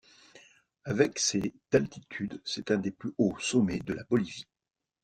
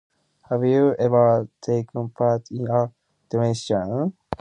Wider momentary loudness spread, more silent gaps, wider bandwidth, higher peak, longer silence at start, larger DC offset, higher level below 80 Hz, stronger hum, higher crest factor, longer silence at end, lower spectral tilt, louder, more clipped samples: about the same, 11 LU vs 10 LU; neither; first, 13 kHz vs 10 kHz; second, -10 dBFS vs -6 dBFS; second, 0.35 s vs 0.5 s; neither; about the same, -60 dBFS vs -56 dBFS; neither; first, 22 dB vs 16 dB; first, 0.6 s vs 0.05 s; second, -4.5 dB/octave vs -7.5 dB/octave; second, -30 LUFS vs -22 LUFS; neither